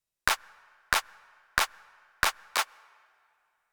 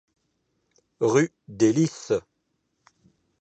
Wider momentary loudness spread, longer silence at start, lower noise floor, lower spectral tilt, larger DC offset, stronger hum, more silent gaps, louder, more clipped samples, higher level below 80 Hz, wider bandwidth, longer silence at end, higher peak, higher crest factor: second, 3 LU vs 7 LU; second, 0.25 s vs 1 s; about the same, -72 dBFS vs -75 dBFS; second, 0 dB/octave vs -6 dB/octave; neither; neither; neither; second, -30 LUFS vs -24 LUFS; neither; first, -54 dBFS vs -66 dBFS; first, over 20 kHz vs 8.6 kHz; about the same, 1.1 s vs 1.2 s; first, -4 dBFS vs -8 dBFS; first, 28 dB vs 20 dB